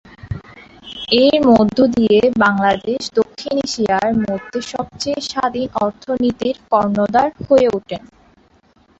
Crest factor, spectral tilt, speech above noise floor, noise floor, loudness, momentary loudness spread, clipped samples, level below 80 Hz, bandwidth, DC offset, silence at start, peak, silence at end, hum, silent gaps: 16 dB; -5 dB/octave; 38 dB; -53 dBFS; -16 LUFS; 15 LU; under 0.1%; -46 dBFS; 8 kHz; under 0.1%; 0.25 s; 0 dBFS; 1 s; none; none